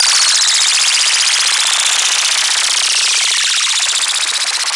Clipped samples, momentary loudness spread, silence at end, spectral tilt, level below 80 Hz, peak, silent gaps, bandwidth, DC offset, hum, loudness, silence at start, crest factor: under 0.1%; 4 LU; 0 s; 6.5 dB/octave; -76 dBFS; 0 dBFS; none; 11.5 kHz; under 0.1%; none; -10 LUFS; 0 s; 14 dB